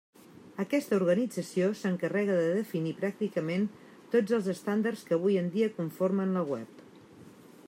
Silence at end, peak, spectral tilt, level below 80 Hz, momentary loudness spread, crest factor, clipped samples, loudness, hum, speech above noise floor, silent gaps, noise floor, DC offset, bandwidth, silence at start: 0.4 s; -14 dBFS; -7 dB/octave; -80 dBFS; 6 LU; 16 dB; under 0.1%; -30 LUFS; none; 24 dB; none; -53 dBFS; under 0.1%; 16 kHz; 0.45 s